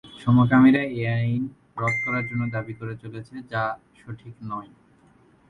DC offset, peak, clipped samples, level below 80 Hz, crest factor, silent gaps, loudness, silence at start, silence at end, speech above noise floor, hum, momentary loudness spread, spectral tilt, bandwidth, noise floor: under 0.1%; -6 dBFS; under 0.1%; -56 dBFS; 18 dB; none; -23 LUFS; 0.05 s; 0.85 s; 34 dB; none; 21 LU; -8.5 dB/octave; 9.2 kHz; -57 dBFS